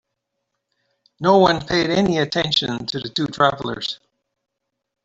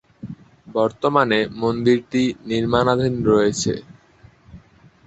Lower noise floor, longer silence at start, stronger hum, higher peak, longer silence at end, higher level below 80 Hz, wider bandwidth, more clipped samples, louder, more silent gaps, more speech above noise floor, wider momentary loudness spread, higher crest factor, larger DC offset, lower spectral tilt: first, -78 dBFS vs -51 dBFS; first, 1.2 s vs 0.25 s; neither; about the same, -2 dBFS vs -2 dBFS; first, 1.1 s vs 0.45 s; about the same, -52 dBFS vs -48 dBFS; about the same, 8 kHz vs 8.2 kHz; neither; about the same, -19 LUFS vs -19 LUFS; neither; first, 59 dB vs 32 dB; second, 11 LU vs 16 LU; about the same, 20 dB vs 18 dB; neither; about the same, -5 dB/octave vs -5.5 dB/octave